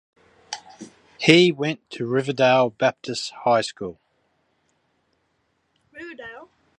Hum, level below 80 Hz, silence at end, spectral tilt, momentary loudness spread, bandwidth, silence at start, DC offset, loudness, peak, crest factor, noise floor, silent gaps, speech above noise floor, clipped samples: none; -68 dBFS; 0.35 s; -5 dB/octave; 22 LU; 11 kHz; 0.5 s; under 0.1%; -20 LUFS; 0 dBFS; 24 dB; -70 dBFS; none; 50 dB; under 0.1%